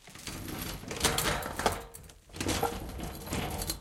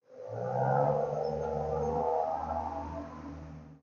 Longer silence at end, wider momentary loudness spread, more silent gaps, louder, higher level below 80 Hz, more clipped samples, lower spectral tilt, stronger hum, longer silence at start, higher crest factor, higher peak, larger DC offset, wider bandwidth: about the same, 0 s vs 0.05 s; second, 13 LU vs 16 LU; neither; about the same, -33 LUFS vs -33 LUFS; first, -46 dBFS vs -52 dBFS; neither; second, -3 dB/octave vs -8.5 dB/octave; neither; about the same, 0.05 s vs 0.1 s; first, 28 dB vs 16 dB; first, -6 dBFS vs -16 dBFS; neither; first, 17 kHz vs 7 kHz